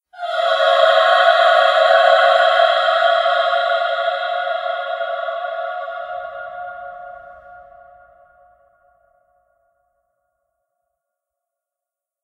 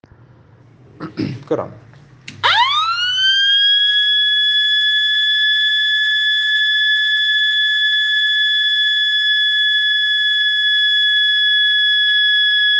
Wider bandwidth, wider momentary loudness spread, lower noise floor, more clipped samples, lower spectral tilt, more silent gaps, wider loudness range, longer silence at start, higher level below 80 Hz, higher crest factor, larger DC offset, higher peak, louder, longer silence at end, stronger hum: first, 11.5 kHz vs 9.2 kHz; first, 18 LU vs 4 LU; first, -87 dBFS vs -46 dBFS; neither; second, 1.5 dB/octave vs -1.5 dB/octave; neither; first, 21 LU vs 3 LU; second, 0.15 s vs 1 s; about the same, -70 dBFS vs -66 dBFS; about the same, 18 dB vs 14 dB; neither; about the same, 0 dBFS vs -2 dBFS; second, -15 LUFS vs -12 LUFS; first, 4.6 s vs 0 s; neither